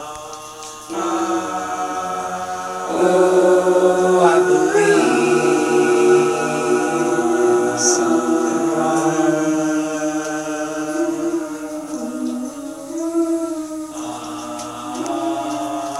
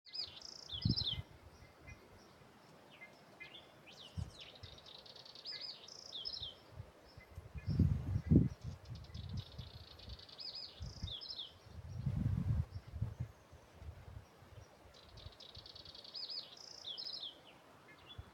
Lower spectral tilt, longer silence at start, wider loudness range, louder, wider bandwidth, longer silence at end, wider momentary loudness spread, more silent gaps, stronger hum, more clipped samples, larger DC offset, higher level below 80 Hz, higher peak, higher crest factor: second, -4 dB/octave vs -6.5 dB/octave; about the same, 0 s vs 0.05 s; second, 10 LU vs 14 LU; first, -18 LUFS vs -42 LUFS; second, 13.5 kHz vs 16 kHz; about the same, 0 s vs 0 s; second, 14 LU vs 23 LU; neither; neither; neither; neither; second, -60 dBFS vs -54 dBFS; first, 0 dBFS vs -14 dBFS; second, 18 dB vs 28 dB